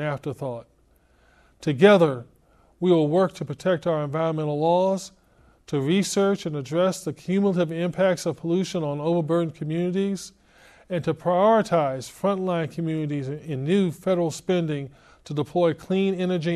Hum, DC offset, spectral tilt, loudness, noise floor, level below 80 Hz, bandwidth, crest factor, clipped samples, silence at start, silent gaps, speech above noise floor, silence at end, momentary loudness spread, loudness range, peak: none; under 0.1%; -6.5 dB/octave; -24 LUFS; -60 dBFS; -62 dBFS; 13.5 kHz; 20 dB; under 0.1%; 0 s; none; 37 dB; 0 s; 12 LU; 3 LU; -4 dBFS